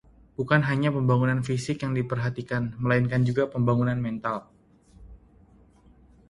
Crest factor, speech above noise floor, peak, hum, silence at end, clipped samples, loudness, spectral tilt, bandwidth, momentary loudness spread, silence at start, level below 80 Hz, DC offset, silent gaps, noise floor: 20 dB; 31 dB; -6 dBFS; none; 1.15 s; under 0.1%; -26 LUFS; -7.5 dB/octave; 11 kHz; 8 LU; 0.4 s; -52 dBFS; under 0.1%; none; -56 dBFS